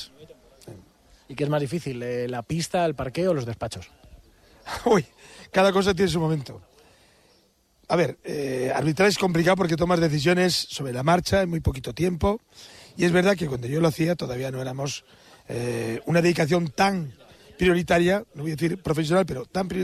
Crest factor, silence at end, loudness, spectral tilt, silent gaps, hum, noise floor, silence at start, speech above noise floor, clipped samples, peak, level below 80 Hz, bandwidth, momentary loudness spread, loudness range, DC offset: 16 dB; 0 s; -24 LUFS; -5.5 dB/octave; none; none; -63 dBFS; 0 s; 39 dB; under 0.1%; -8 dBFS; -46 dBFS; 14 kHz; 11 LU; 5 LU; under 0.1%